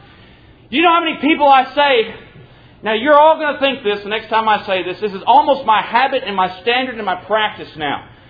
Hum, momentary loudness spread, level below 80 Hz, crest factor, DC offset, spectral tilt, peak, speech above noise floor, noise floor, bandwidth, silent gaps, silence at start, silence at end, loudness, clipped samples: none; 11 LU; -52 dBFS; 16 dB; under 0.1%; -6.5 dB/octave; 0 dBFS; 29 dB; -44 dBFS; 5 kHz; none; 0.7 s; 0.25 s; -15 LUFS; under 0.1%